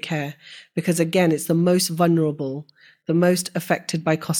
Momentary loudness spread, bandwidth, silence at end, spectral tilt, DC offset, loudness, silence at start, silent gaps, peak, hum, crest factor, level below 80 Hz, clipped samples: 12 LU; 18.5 kHz; 0 s; -5.5 dB/octave; under 0.1%; -21 LUFS; 0.05 s; none; -4 dBFS; none; 16 dB; -64 dBFS; under 0.1%